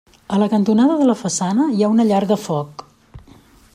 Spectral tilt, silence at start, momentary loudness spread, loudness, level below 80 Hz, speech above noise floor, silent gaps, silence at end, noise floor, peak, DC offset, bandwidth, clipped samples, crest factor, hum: -6 dB/octave; 0.3 s; 9 LU; -17 LUFS; -54 dBFS; 31 dB; none; 0.55 s; -47 dBFS; -4 dBFS; under 0.1%; 14.5 kHz; under 0.1%; 14 dB; none